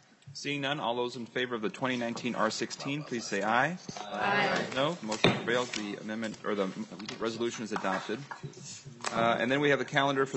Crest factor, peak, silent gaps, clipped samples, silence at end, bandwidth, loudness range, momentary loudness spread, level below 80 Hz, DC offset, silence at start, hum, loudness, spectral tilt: 26 dB; -6 dBFS; none; under 0.1%; 0 s; 8.4 kHz; 4 LU; 12 LU; -70 dBFS; under 0.1%; 0.25 s; none; -31 LUFS; -4 dB/octave